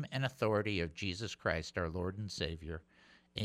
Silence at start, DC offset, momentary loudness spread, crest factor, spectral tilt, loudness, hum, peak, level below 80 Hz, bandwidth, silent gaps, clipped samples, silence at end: 0 s; under 0.1%; 12 LU; 20 dB; -5.5 dB/octave; -38 LUFS; none; -18 dBFS; -56 dBFS; 15 kHz; none; under 0.1%; 0 s